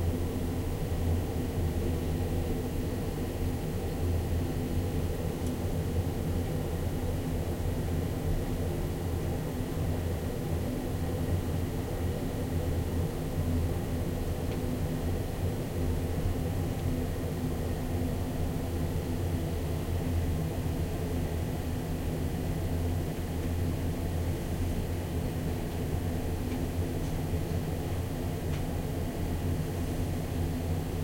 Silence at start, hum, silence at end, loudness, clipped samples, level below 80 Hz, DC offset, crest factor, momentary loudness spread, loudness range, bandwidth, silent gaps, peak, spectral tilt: 0 s; none; 0 s; -33 LUFS; under 0.1%; -38 dBFS; under 0.1%; 12 dB; 2 LU; 1 LU; 16.5 kHz; none; -18 dBFS; -7 dB/octave